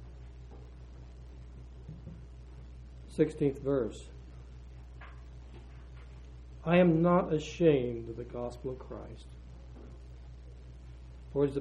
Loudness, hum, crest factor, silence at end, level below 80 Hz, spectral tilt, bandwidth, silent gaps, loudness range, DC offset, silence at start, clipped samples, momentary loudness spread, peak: -30 LUFS; none; 22 dB; 0 s; -50 dBFS; -8 dB/octave; 9.8 kHz; none; 13 LU; under 0.1%; 0 s; under 0.1%; 24 LU; -12 dBFS